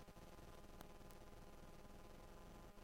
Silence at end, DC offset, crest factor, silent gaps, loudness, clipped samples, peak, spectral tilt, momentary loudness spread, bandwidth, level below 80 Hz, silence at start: 0 s; under 0.1%; 24 dB; none; -62 LUFS; under 0.1%; -34 dBFS; -5 dB/octave; 1 LU; 16 kHz; -62 dBFS; 0 s